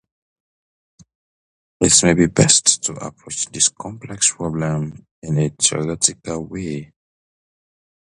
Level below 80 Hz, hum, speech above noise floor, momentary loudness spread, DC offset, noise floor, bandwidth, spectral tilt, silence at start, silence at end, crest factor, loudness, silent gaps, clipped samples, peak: -46 dBFS; none; over 71 dB; 18 LU; under 0.1%; under -90 dBFS; 11.5 kHz; -3 dB/octave; 1.8 s; 1.25 s; 20 dB; -17 LUFS; 5.11-5.22 s; under 0.1%; 0 dBFS